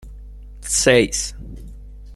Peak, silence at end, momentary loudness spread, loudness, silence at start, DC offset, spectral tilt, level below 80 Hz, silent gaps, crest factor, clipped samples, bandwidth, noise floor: -2 dBFS; 0 s; 23 LU; -17 LUFS; 0.05 s; under 0.1%; -3 dB/octave; -36 dBFS; none; 20 dB; under 0.1%; 15 kHz; -37 dBFS